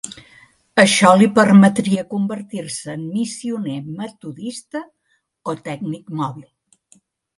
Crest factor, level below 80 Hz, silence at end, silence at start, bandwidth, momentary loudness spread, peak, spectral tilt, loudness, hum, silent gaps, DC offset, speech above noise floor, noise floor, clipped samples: 18 dB; -62 dBFS; 0.95 s; 0.05 s; 11.5 kHz; 20 LU; 0 dBFS; -5 dB/octave; -17 LUFS; none; none; under 0.1%; 39 dB; -56 dBFS; under 0.1%